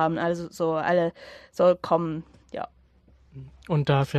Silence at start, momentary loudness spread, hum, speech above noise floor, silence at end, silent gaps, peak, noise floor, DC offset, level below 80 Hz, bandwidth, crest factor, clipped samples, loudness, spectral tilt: 0 s; 21 LU; none; 33 dB; 0 s; none; -8 dBFS; -58 dBFS; under 0.1%; -56 dBFS; 13 kHz; 18 dB; under 0.1%; -25 LUFS; -7.5 dB/octave